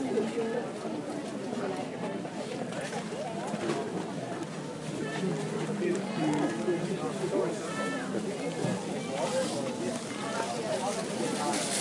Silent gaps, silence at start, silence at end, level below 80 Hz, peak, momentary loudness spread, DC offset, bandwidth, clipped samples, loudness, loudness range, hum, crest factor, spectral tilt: none; 0 s; 0 s; -74 dBFS; -16 dBFS; 6 LU; under 0.1%; 11.5 kHz; under 0.1%; -33 LUFS; 4 LU; none; 16 dB; -4.5 dB/octave